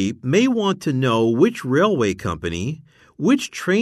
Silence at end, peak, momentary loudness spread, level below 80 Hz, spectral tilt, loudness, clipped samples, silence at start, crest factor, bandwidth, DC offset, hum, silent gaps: 0 s; -2 dBFS; 8 LU; -50 dBFS; -6 dB/octave; -20 LUFS; under 0.1%; 0 s; 16 dB; 13.5 kHz; under 0.1%; none; none